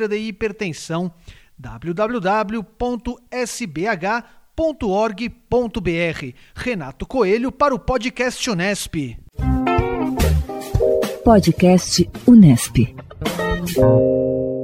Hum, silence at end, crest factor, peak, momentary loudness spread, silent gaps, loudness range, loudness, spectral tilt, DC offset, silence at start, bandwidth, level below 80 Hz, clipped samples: none; 0 s; 18 dB; 0 dBFS; 13 LU; none; 9 LU; -19 LUFS; -6 dB/octave; under 0.1%; 0 s; 16.5 kHz; -32 dBFS; under 0.1%